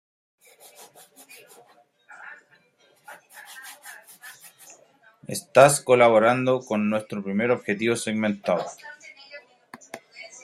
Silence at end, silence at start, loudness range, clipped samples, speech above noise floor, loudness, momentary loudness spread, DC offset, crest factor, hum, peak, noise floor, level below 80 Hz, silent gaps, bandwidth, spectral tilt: 0.15 s; 2.1 s; 22 LU; under 0.1%; 40 dB; -21 LUFS; 28 LU; under 0.1%; 24 dB; none; -2 dBFS; -61 dBFS; -70 dBFS; none; 15.5 kHz; -4.5 dB/octave